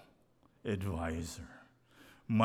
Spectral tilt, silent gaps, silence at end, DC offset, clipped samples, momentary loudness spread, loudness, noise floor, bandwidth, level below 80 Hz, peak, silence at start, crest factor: -6.5 dB/octave; none; 0 s; under 0.1%; under 0.1%; 23 LU; -39 LUFS; -68 dBFS; 15.5 kHz; -54 dBFS; -18 dBFS; 0.65 s; 20 dB